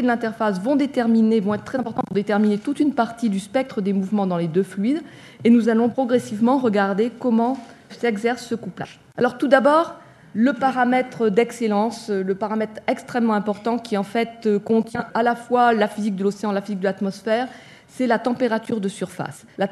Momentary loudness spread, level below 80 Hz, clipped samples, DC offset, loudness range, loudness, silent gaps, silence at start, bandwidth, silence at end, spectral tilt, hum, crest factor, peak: 9 LU; -64 dBFS; under 0.1%; under 0.1%; 3 LU; -21 LUFS; none; 0 s; 12.5 kHz; 0 s; -6.5 dB/octave; none; 20 dB; 0 dBFS